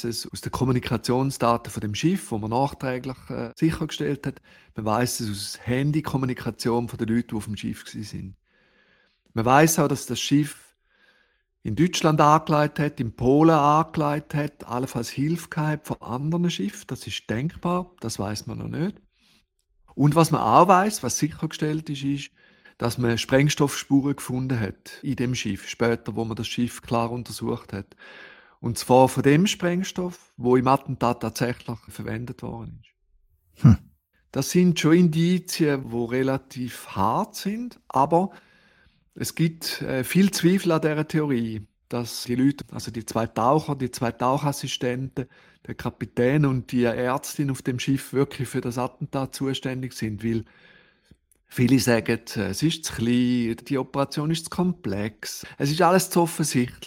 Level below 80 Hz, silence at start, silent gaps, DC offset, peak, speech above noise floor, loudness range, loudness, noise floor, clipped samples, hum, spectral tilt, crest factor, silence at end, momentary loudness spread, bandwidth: -52 dBFS; 0 s; none; under 0.1%; -2 dBFS; 43 dB; 6 LU; -24 LUFS; -66 dBFS; under 0.1%; none; -5.5 dB/octave; 22 dB; 0 s; 14 LU; 17 kHz